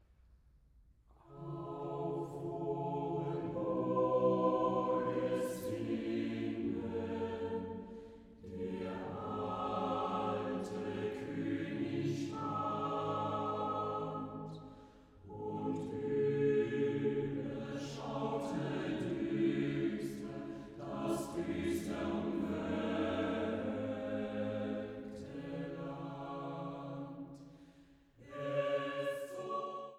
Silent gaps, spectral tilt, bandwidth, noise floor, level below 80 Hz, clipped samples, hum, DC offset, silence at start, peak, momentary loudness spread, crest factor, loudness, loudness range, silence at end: none; -7 dB/octave; 15 kHz; -65 dBFS; -66 dBFS; under 0.1%; none; under 0.1%; 0.3 s; -22 dBFS; 12 LU; 18 dB; -38 LUFS; 7 LU; 0 s